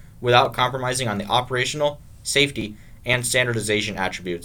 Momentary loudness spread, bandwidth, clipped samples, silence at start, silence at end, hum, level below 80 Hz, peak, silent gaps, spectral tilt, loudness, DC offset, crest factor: 9 LU; 19 kHz; under 0.1%; 0 s; 0 s; none; -46 dBFS; 0 dBFS; none; -3.5 dB/octave; -21 LUFS; under 0.1%; 22 dB